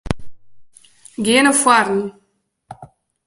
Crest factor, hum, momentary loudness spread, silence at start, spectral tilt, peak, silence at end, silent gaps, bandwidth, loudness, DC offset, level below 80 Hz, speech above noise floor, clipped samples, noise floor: 20 dB; none; 18 LU; 0.05 s; -3 dB/octave; 0 dBFS; 0.4 s; none; 12 kHz; -15 LUFS; under 0.1%; -42 dBFS; 35 dB; under 0.1%; -50 dBFS